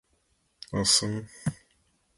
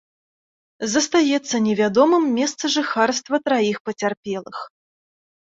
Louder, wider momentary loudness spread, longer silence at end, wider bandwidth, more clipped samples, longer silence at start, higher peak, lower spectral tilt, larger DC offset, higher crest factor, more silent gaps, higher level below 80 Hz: second, -26 LUFS vs -20 LUFS; about the same, 13 LU vs 13 LU; about the same, 0.65 s vs 0.75 s; first, 12 kHz vs 8 kHz; neither; about the same, 0.7 s vs 0.8 s; second, -8 dBFS vs -4 dBFS; about the same, -2.5 dB/octave vs -3.5 dB/octave; neither; about the same, 22 dB vs 18 dB; second, none vs 3.80-3.85 s, 4.17-4.23 s; first, -56 dBFS vs -66 dBFS